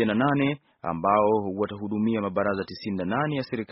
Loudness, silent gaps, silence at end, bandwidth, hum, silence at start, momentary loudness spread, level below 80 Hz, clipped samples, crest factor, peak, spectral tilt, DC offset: -26 LUFS; none; 0 s; 5.8 kHz; none; 0 s; 9 LU; -60 dBFS; under 0.1%; 18 dB; -8 dBFS; -5.5 dB/octave; under 0.1%